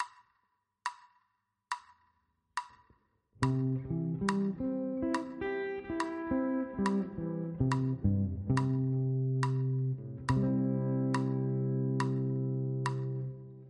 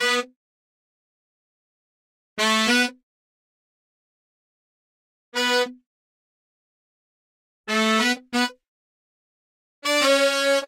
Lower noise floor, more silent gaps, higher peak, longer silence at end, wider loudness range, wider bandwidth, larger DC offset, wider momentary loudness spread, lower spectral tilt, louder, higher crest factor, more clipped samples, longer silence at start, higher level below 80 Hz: second, -79 dBFS vs under -90 dBFS; second, none vs 0.36-2.36 s, 3.03-5.32 s, 5.86-7.64 s, 8.68-9.82 s; second, -14 dBFS vs -6 dBFS; about the same, 0 s vs 0 s; about the same, 7 LU vs 6 LU; second, 10.5 kHz vs 16 kHz; neither; about the same, 11 LU vs 12 LU; first, -8 dB/octave vs -1.5 dB/octave; second, -34 LUFS vs -21 LUFS; about the same, 20 dB vs 20 dB; neither; about the same, 0 s vs 0 s; first, -56 dBFS vs -76 dBFS